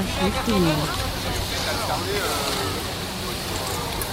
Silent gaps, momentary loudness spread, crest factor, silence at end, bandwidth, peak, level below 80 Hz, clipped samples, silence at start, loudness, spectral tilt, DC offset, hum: none; 6 LU; 16 dB; 0 s; 16 kHz; -8 dBFS; -36 dBFS; under 0.1%; 0 s; -24 LUFS; -4 dB/octave; under 0.1%; none